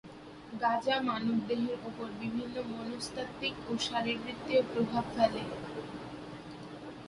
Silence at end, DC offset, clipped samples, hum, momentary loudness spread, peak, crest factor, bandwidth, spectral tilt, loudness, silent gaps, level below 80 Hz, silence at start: 0 s; under 0.1%; under 0.1%; none; 15 LU; -14 dBFS; 20 dB; 11.5 kHz; -5 dB/octave; -34 LUFS; none; -62 dBFS; 0.05 s